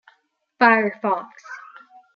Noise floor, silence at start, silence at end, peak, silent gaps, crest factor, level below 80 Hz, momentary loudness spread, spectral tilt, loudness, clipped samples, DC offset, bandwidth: -65 dBFS; 0.6 s; 0.55 s; -2 dBFS; none; 22 dB; -74 dBFS; 22 LU; -6 dB/octave; -19 LUFS; under 0.1%; under 0.1%; 7 kHz